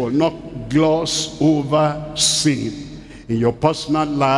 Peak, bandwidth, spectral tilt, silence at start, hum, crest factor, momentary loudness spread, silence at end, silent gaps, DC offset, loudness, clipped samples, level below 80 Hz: 0 dBFS; 12 kHz; -4.5 dB/octave; 0 s; none; 18 dB; 12 LU; 0 s; none; under 0.1%; -18 LUFS; under 0.1%; -44 dBFS